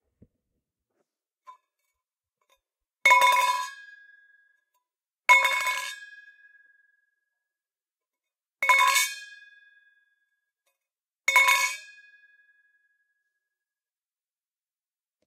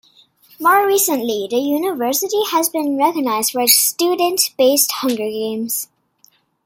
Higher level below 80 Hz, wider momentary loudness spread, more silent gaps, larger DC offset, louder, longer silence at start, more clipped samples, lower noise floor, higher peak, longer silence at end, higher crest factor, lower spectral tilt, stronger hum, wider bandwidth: second, -86 dBFS vs -68 dBFS; first, 18 LU vs 9 LU; neither; neither; second, -21 LUFS vs -16 LUFS; first, 1.5 s vs 0.6 s; neither; first, under -90 dBFS vs -56 dBFS; second, -6 dBFS vs 0 dBFS; first, 3.45 s vs 0.8 s; first, 24 dB vs 18 dB; second, 3 dB/octave vs -1.5 dB/octave; neither; about the same, 16.5 kHz vs 17 kHz